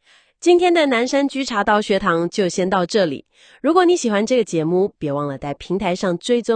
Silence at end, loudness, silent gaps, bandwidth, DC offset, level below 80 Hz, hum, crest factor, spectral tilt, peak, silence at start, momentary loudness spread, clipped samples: 0 s; -18 LUFS; none; 9.6 kHz; under 0.1%; -52 dBFS; none; 18 dB; -5 dB/octave; 0 dBFS; 0.45 s; 9 LU; under 0.1%